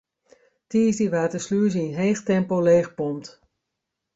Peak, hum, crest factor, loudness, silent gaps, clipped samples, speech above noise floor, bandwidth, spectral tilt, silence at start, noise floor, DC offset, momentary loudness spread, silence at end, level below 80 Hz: -8 dBFS; none; 16 dB; -22 LUFS; none; under 0.1%; 60 dB; 8 kHz; -6.5 dB/octave; 0.7 s; -82 dBFS; under 0.1%; 9 LU; 0.85 s; -64 dBFS